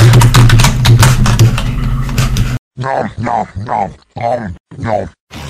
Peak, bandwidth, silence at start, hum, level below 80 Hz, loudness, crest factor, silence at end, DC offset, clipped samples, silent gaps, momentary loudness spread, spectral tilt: 0 dBFS; 15.5 kHz; 0 s; none; -18 dBFS; -12 LUFS; 10 dB; 0 s; under 0.1%; under 0.1%; 2.59-2.71 s, 4.60-4.64 s, 5.20-5.27 s; 13 LU; -5.5 dB/octave